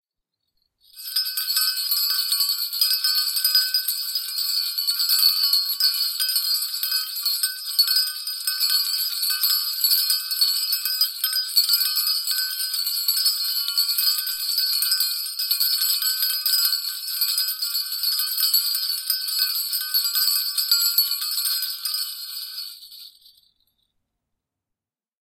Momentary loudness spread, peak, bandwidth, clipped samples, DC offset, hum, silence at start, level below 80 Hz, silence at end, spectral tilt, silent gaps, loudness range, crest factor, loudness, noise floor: 6 LU; -4 dBFS; 17 kHz; under 0.1%; under 0.1%; none; 0.95 s; -80 dBFS; 2.2 s; 9 dB/octave; none; 3 LU; 20 dB; -20 LUFS; -87 dBFS